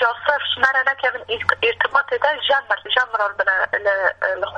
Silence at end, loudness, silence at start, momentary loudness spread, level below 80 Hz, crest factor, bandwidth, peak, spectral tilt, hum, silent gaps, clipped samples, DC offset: 0 s; -19 LUFS; 0 s; 4 LU; -58 dBFS; 20 dB; 10.5 kHz; 0 dBFS; -2.5 dB/octave; none; none; under 0.1%; under 0.1%